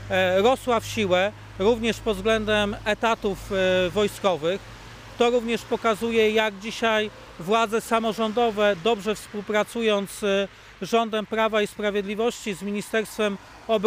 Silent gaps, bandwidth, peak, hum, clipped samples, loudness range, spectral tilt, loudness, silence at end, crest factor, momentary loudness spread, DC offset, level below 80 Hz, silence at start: none; 16 kHz; -8 dBFS; none; under 0.1%; 2 LU; -4.5 dB/octave; -24 LUFS; 0 s; 16 dB; 7 LU; under 0.1%; -48 dBFS; 0 s